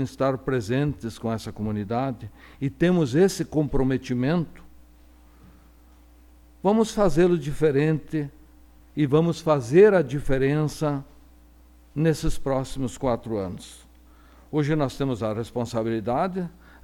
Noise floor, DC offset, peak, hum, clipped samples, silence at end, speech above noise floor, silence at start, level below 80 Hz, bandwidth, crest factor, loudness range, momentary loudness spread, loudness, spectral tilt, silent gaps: -52 dBFS; under 0.1%; -6 dBFS; none; under 0.1%; 0.35 s; 29 dB; 0 s; -42 dBFS; 19 kHz; 20 dB; 6 LU; 12 LU; -24 LUFS; -7 dB/octave; none